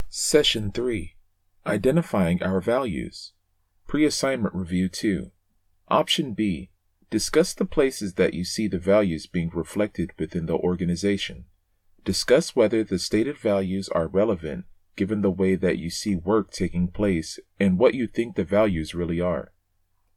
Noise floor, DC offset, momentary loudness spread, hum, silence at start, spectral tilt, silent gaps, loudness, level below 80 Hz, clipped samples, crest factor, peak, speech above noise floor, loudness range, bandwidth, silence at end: -68 dBFS; under 0.1%; 9 LU; none; 0 s; -5 dB/octave; none; -24 LUFS; -46 dBFS; under 0.1%; 20 dB; -4 dBFS; 44 dB; 2 LU; 15.5 kHz; 0.7 s